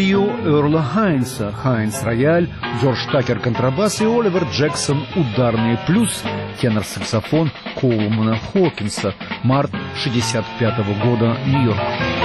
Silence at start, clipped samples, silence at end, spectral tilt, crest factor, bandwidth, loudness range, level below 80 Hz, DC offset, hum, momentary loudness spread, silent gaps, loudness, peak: 0 s; under 0.1%; 0 s; -6 dB/octave; 12 dB; 12.5 kHz; 2 LU; -44 dBFS; under 0.1%; none; 6 LU; none; -18 LUFS; -6 dBFS